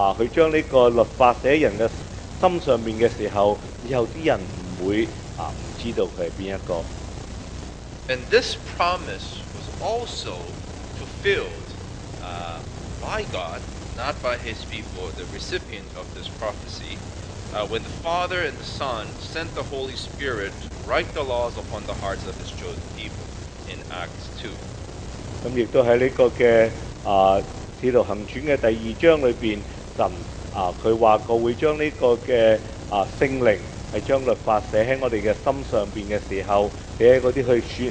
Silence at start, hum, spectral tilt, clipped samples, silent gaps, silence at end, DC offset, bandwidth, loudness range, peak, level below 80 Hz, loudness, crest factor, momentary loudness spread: 0 s; none; -5.5 dB/octave; under 0.1%; none; 0 s; under 0.1%; 9.6 kHz; 10 LU; -2 dBFS; -40 dBFS; -23 LUFS; 22 dB; 17 LU